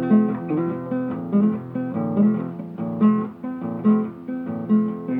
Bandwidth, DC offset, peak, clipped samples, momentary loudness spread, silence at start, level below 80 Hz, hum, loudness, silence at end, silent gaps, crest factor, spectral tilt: 3.5 kHz; under 0.1%; -6 dBFS; under 0.1%; 10 LU; 0 s; -66 dBFS; none; -23 LUFS; 0 s; none; 16 dB; -11.5 dB/octave